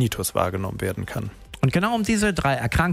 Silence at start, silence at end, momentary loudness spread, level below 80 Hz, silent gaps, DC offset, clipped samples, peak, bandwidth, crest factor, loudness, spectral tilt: 0 s; 0 s; 10 LU; -40 dBFS; none; under 0.1%; under 0.1%; -6 dBFS; 16 kHz; 16 dB; -23 LUFS; -5.5 dB/octave